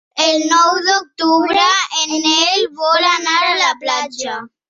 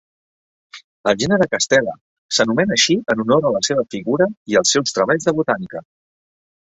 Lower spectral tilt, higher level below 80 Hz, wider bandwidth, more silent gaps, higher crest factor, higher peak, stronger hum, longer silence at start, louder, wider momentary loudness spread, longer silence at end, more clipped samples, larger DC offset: second, 0 dB/octave vs -3.5 dB/octave; second, -64 dBFS vs -56 dBFS; about the same, 7.8 kHz vs 8.2 kHz; second, none vs 0.84-1.04 s, 2.01-2.29 s, 4.37-4.46 s; about the same, 14 dB vs 16 dB; about the same, 0 dBFS vs -2 dBFS; neither; second, 0.15 s vs 0.75 s; first, -14 LUFS vs -17 LUFS; about the same, 7 LU vs 7 LU; second, 0.25 s vs 0.85 s; neither; neither